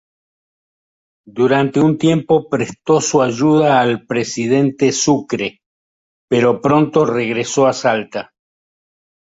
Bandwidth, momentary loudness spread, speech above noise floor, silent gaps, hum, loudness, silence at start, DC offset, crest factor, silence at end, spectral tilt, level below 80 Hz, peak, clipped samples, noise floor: 8 kHz; 8 LU; over 75 dB; 5.66-6.28 s; none; -15 LUFS; 1.35 s; under 0.1%; 14 dB; 1.15 s; -5 dB/octave; -56 dBFS; -2 dBFS; under 0.1%; under -90 dBFS